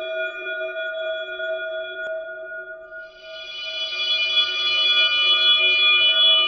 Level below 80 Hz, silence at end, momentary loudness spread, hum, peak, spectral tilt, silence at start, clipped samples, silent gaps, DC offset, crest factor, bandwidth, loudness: -68 dBFS; 0 s; 21 LU; none; -6 dBFS; 0 dB/octave; 0 s; under 0.1%; none; under 0.1%; 16 dB; 6.6 kHz; -18 LUFS